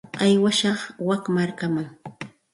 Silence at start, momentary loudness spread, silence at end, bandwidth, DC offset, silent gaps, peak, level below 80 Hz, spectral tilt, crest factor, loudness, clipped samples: 0.15 s; 19 LU; 0.25 s; 11.5 kHz; under 0.1%; none; -8 dBFS; -64 dBFS; -5 dB/octave; 16 dB; -22 LUFS; under 0.1%